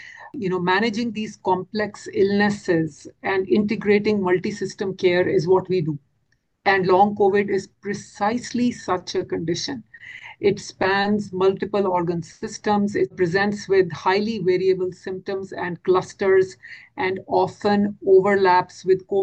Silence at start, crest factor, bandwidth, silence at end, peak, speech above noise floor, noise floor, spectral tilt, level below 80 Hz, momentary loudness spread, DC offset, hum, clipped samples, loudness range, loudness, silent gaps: 0 s; 16 dB; 8.6 kHz; 0 s; -4 dBFS; 47 dB; -69 dBFS; -6 dB/octave; -58 dBFS; 12 LU; under 0.1%; none; under 0.1%; 3 LU; -21 LUFS; none